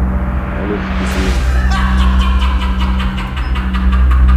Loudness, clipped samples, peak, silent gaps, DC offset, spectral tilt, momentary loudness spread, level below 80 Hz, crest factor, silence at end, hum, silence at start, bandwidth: -15 LUFS; under 0.1%; 0 dBFS; none; under 0.1%; -6.5 dB/octave; 6 LU; -14 dBFS; 12 dB; 0 s; none; 0 s; 9.8 kHz